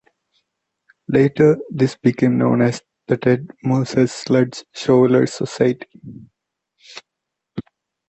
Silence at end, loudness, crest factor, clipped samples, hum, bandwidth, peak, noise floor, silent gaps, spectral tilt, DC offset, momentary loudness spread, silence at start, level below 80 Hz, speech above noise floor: 0.5 s; -18 LUFS; 16 dB; under 0.1%; none; 8.4 kHz; -2 dBFS; -81 dBFS; none; -7 dB/octave; under 0.1%; 23 LU; 1.1 s; -56 dBFS; 64 dB